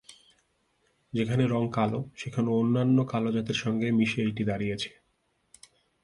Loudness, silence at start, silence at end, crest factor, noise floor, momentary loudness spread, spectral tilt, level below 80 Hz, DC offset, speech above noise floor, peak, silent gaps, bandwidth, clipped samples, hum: -28 LUFS; 0.1 s; 1.15 s; 18 dB; -73 dBFS; 10 LU; -7 dB/octave; -60 dBFS; under 0.1%; 46 dB; -12 dBFS; none; 11.5 kHz; under 0.1%; none